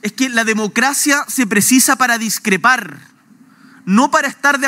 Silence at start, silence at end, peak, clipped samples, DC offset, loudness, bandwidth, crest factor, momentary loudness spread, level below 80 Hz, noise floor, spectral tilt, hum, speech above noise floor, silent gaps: 0.05 s; 0 s; 0 dBFS; under 0.1%; under 0.1%; -13 LUFS; 16.5 kHz; 16 dB; 6 LU; -66 dBFS; -47 dBFS; -2.5 dB/octave; none; 33 dB; none